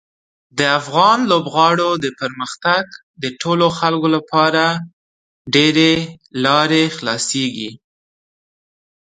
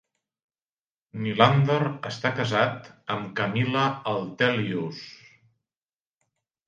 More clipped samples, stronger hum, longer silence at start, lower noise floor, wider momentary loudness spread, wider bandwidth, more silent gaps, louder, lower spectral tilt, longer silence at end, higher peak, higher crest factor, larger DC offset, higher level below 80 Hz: neither; neither; second, 0.55 s vs 1.15 s; about the same, under -90 dBFS vs under -90 dBFS; about the same, 13 LU vs 15 LU; first, 9.6 kHz vs 7.4 kHz; first, 3.03-3.14 s, 4.93-5.45 s vs none; first, -16 LUFS vs -25 LUFS; second, -4 dB/octave vs -6.5 dB/octave; second, 1.25 s vs 1.55 s; about the same, 0 dBFS vs -2 dBFS; second, 18 dB vs 24 dB; neither; first, -58 dBFS vs -66 dBFS